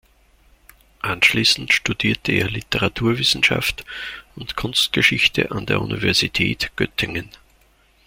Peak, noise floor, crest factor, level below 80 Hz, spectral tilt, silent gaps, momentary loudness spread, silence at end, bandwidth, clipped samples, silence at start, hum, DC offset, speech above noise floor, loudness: -2 dBFS; -57 dBFS; 20 dB; -44 dBFS; -3.5 dB/octave; none; 15 LU; 0.8 s; 16.5 kHz; under 0.1%; 1.05 s; none; under 0.1%; 36 dB; -18 LUFS